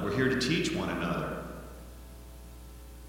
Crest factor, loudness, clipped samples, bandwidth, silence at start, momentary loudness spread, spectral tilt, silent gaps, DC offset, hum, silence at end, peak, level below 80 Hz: 20 dB; -30 LUFS; under 0.1%; 17 kHz; 0 s; 21 LU; -5 dB/octave; none; under 0.1%; none; 0 s; -14 dBFS; -48 dBFS